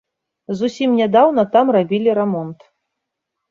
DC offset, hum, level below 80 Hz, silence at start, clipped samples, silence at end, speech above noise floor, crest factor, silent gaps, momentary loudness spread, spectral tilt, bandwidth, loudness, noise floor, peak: under 0.1%; none; -64 dBFS; 0.5 s; under 0.1%; 0.95 s; 63 dB; 16 dB; none; 12 LU; -7 dB/octave; 7.6 kHz; -16 LUFS; -79 dBFS; -2 dBFS